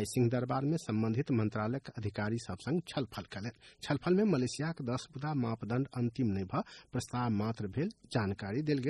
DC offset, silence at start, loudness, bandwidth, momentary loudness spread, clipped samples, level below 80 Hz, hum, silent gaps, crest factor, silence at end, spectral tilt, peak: under 0.1%; 0 s; -35 LUFS; 11.5 kHz; 8 LU; under 0.1%; -64 dBFS; none; none; 16 dB; 0 s; -6.5 dB/octave; -18 dBFS